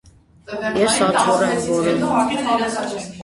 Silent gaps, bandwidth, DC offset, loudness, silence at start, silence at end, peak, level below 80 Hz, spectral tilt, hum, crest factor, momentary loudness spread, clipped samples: none; 11.5 kHz; under 0.1%; -18 LUFS; 0.5 s; 0 s; -2 dBFS; -52 dBFS; -4 dB/octave; none; 16 dB; 10 LU; under 0.1%